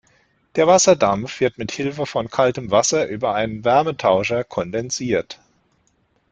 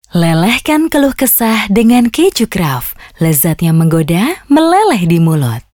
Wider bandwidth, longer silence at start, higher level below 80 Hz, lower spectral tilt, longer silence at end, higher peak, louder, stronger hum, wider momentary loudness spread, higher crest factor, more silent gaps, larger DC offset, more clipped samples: second, 9.4 kHz vs 20 kHz; first, 0.55 s vs 0.15 s; second, -54 dBFS vs -38 dBFS; second, -4 dB/octave vs -5.5 dB/octave; first, 0.95 s vs 0.15 s; about the same, -2 dBFS vs 0 dBFS; second, -19 LUFS vs -11 LUFS; neither; first, 10 LU vs 6 LU; first, 18 dB vs 10 dB; neither; neither; neither